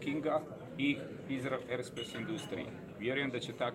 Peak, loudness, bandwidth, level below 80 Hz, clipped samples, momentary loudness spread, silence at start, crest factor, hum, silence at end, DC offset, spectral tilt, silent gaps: -20 dBFS; -38 LUFS; 15 kHz; -70 dBFS; under 0.1%; 7 LU; 0 s; 18 dB; none; 0 s; under 0.1%; -5.5 dB/octave; none